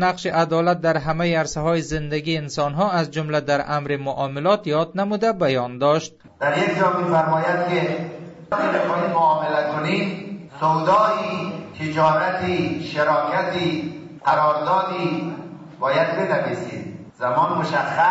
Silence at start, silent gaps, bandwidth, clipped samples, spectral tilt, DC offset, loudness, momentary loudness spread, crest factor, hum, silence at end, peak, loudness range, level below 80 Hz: 0 s; none; 8 kHz; under 0.1%; -6 dB/octave; under 0.1%; -21 LUFS; 9 LU; 16 dB; none; 0 s; -6 dBFS; 2 LU; -52 dBFS